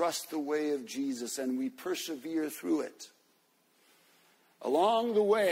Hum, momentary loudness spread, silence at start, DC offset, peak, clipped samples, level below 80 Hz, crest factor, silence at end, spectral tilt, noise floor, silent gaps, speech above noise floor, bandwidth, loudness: none; 10 LU; 0 s; under 0.1%; -16 dBFS; under 0.1%; -82 dBFS; 16 dB; 0 s; -3.5 dB/octave; -70 dBFS; none; 39 dB; 16 kHz; -32 LUFS